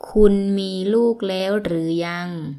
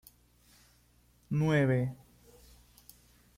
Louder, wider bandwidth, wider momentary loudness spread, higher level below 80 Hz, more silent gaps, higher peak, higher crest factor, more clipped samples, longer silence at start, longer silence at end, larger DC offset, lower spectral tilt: first, -20 LUFS vs -30 LUFS; second, 12.5 kHz vs 16 kHz; second, 8 LU vs 13 LU; first, -34 dBFS vs -62 dBFS; neither; first, 0 dBFS vs -16 dBFS; about the same, 18 dB vs 18 dB; neither; second, 0.05 s vs 1.3 s; second, 0 s vs 1.45 s; neither; about the same, -7 dB/octave vs -7.5 dB/octave